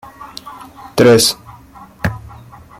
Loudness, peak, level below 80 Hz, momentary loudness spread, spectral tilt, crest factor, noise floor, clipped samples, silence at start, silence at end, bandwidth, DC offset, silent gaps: -13 LUFS; 0 dBFS; -42 dBFS; 24 LU; -4 dB/octave; 16 dB; -39 dBFS; under 0.1%; 0.2 s; 0.6 s; 16.5 kHz; under 0.1%; none